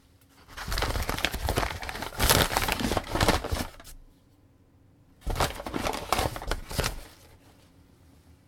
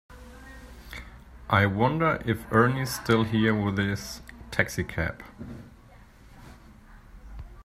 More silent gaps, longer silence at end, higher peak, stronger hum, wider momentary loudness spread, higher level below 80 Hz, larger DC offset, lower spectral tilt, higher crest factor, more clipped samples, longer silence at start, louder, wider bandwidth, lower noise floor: neither; first, 0.15 s vs 0 s; first, -2 dBFS vs -6 dBFS; neither; second, 17 LU vs 24 LU; first, -38 dBFS vs -48 dBFS; neither; second, -3.5 dB/octave vs -6 dB/octave; first, 30 dB vs 22 dB; neither; first, 0.5 s vs 0.1 s; about the same, -28 LUFS vs -26 LUFS; first, over 20 kHz vs 16 kHz; first, -59 dBFS vs -52 dBFS